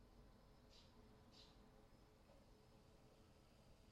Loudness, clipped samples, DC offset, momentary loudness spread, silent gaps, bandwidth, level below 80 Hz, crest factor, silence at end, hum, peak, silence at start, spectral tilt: -68 LUFS; under 0.1%; under 0.1%; 3 LU; none; 13 kHz; -74 dBFS; 14 dB; 0 s; none; -54 dBFS; 0 s; -5 dB/octave